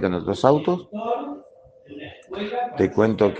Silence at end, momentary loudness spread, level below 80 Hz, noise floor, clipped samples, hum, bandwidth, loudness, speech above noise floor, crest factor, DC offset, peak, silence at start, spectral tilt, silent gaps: 0 s; 20 LU; -58 dBFS; -50 dBFS; under 0.1%; none; 9 kHz; -22 LUFS; 29 dB; 22 dB; under 0.1%; 0 dBFS; 0 s; -7.5 dB/octave; none